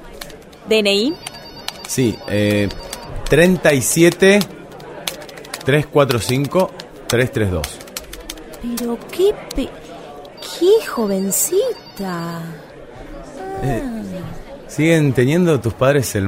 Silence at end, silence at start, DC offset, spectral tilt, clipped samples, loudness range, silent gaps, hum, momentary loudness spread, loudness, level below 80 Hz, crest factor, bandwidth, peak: 0 s; 0 s; under 0.1%; -4.5 dB/octave; under 0.1%; 7 LU; none; none; 21 LU; -17 LUFS; -38 dBFS; 18 dB; 16 kHz; 0 dBFS